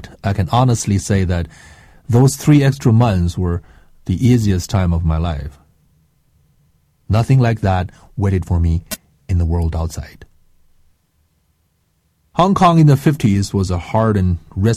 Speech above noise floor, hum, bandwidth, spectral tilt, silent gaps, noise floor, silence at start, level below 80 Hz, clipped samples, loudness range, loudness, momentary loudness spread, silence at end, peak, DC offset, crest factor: 48 dB; none; 15.5 kHz; -7 dB/octave; none; -63 dBFS; 0 s; -30 dBFS; under 0.1%; 7 LU; -16 LUFS; 13 LU; 0 s; -2 dBFS; under 0.1%; 14 dB